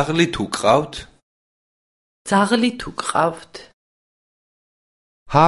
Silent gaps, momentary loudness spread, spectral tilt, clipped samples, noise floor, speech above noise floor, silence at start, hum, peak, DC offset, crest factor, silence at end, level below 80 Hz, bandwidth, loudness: 1.23-2.25 s, 3.73-5.26 s; 19 LU; -5 dB/octave; under 0.1%; under -90 dBFS; over 71 dB; 0 s; none; 0 dBFS; under 0.1%; 22 dB; 0 s; -50 dBFS; 11.5 kHz; -19 LUFS